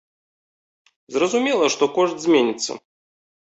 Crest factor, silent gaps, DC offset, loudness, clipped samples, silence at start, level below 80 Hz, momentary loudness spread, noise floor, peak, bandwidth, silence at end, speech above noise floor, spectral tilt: 18 dB; none; under 0.1%; -20 LUFS; under 0.1%; 1.1 s; -68 dBFS; 10 LU; under -90 dBFS; -6 dBFS; 8.2 kHz; 0.75 s; over 71 dB; -3 dB/octave